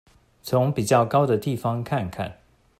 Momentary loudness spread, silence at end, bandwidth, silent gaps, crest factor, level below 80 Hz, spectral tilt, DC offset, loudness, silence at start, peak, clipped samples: 14 LU; 0.45 s; 15.5 kHz; none; 18 dB; -56 dBFS; -6.5 dB/octave; under 0.1%; -23 LUFS; 0.45 s; -6 dBFS; under 0.1%